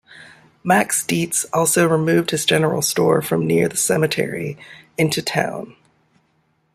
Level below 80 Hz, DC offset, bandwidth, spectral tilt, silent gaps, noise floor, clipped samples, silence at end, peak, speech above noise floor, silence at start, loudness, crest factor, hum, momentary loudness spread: -60 dBFS; under 0.1%; 16 kHz; -4 dB/octave; none; -64 dBFS; under 0.1%; 1.05 s; -2 dBFS; 46 dB; 0.1 s; -18 LUFS; 18 dB; none; 13 LU